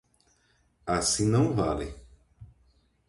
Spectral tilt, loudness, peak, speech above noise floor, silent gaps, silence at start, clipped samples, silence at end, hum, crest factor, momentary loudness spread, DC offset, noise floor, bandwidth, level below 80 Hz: -5 dB/octave; -26 LUFS; -14 dBFS; 42 dB; none; 0.85 s; under 0.1%; 0.65 s; none; 18 dB; 15 LU; under 0.1%; -68 dBFS; 11.5 kHz; -48 dBFS